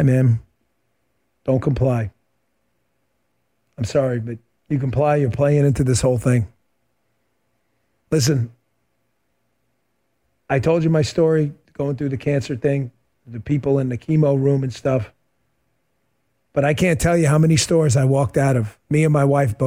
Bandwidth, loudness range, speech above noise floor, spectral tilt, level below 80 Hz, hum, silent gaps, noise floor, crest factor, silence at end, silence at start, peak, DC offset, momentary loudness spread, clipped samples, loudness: 16 kHz; 8 LU; 53 dB; -6.5 dB/octave; -44 dBFS; none; none; -71 dBFS; 14 dB; 0 s; 0 s; -6 dBFS; under 0.1%; 10 LU; under 0.1%; -19 LUFS